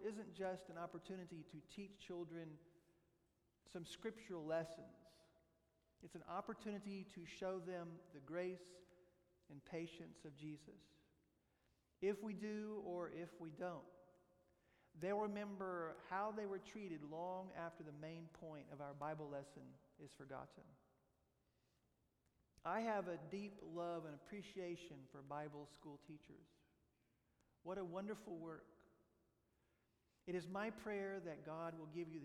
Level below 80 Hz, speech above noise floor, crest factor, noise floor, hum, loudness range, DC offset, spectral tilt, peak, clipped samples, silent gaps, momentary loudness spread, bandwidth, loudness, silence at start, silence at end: -82 dBFS; 33 dB; 20 dB; -83 dBFS; none; 7 LU; under 0.1%; -6.5 dB/octave; -32 dBFS; under 0.1%; none; 15 LU; 13.5 kHz; -50 LUFS; 0 s; 0 s